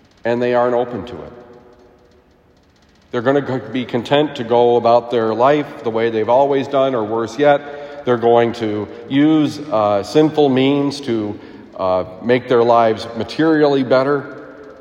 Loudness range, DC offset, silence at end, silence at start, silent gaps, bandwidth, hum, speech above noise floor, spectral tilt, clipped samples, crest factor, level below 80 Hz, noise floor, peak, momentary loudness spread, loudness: 6 LU; under 0.1%; 0.05 s; 0.25 s; none; 10.5 kHz; none; 37 dB; -6.5 dB/octave; under 0.1%; 16 dB; -58 dBFS; -52 dBFS; 0 dBFS; 12 LU; -16 LUFS